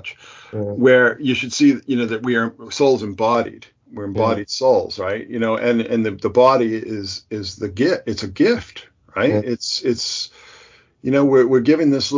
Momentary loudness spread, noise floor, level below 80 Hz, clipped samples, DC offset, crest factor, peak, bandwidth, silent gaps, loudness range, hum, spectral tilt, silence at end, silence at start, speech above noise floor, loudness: 13 LU; -49 dBFS; -50 dBFS; under 0.1%; under 0.1%; 18 dB; 0 dBFS; 7.6 kHz; none; 3 LU; none; -5 dB/octave; 0 s; 0.05 s; 31 dB; -18 LUFS